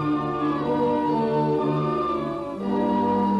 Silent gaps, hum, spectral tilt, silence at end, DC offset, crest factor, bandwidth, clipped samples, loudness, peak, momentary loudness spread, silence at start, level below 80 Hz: none; none; -8.5 dB/octave; 0 s; under 0.1%; 12 dB; 8.2 kHz; under 0.1%; -24 LUFS; -12 dBFS; 5 LU; 0 s; -52 dBFS